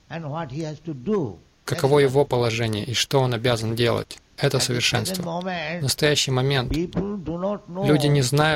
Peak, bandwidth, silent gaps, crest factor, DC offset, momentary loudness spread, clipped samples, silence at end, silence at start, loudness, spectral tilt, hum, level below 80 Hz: -6 dBFS; 16.5 kHz; none; 16 dB; under 0.1%; 12 LU; under 0.1%; 0 s; 0.1 s; -23 LUFS; -4.5 dB/octave; none; -46 dBFS